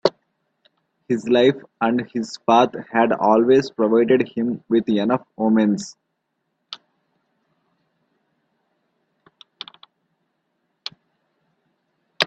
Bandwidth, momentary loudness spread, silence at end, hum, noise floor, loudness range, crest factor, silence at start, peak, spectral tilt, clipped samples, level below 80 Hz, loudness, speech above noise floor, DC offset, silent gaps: 8.4 kHz; 21 LU; 0 s; none; -75 dBFS; 24 LU; 22 dB; 0.05 s; 0 dBFS; -6 dB/octave; under 0.1%; -66 dBFS; -19 LUFS; 56 dB; under 0.1%; none